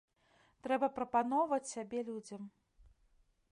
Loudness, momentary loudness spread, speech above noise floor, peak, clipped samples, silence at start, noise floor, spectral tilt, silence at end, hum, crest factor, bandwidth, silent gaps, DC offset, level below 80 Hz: -36 LUFS; 16 LU; 36 dB; -20 dBFS; under 0.1%; 0.65 s; -72 dBFS; -4.5 dB/octave; 1 s; none; 18 dB; 11.5 kHz; none; under 0.1%; -72 dBFS